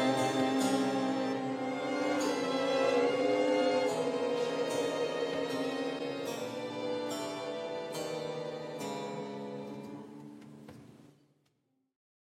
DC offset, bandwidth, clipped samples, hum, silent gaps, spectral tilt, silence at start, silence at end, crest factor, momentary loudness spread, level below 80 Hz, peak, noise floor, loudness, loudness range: under 0.1%; 16 kHz; under 0.1%; none; none; -4.5 dB/octave; 0 s; 1.2 s; 16 dB; 14 LU; -80 dBFS; -18 dBFS; -77 dBFS; -33 LUFS; 12 LU